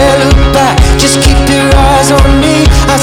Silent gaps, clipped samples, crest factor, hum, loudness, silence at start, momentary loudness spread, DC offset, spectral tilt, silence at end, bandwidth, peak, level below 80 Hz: none; 3%; 6 dB; none; -6 LUFS; 0 s; 1 LU; under 0.1%; -4.5 dB/octave; 0 s; 16.5 kHz; 0 dBFS; -10 dBFS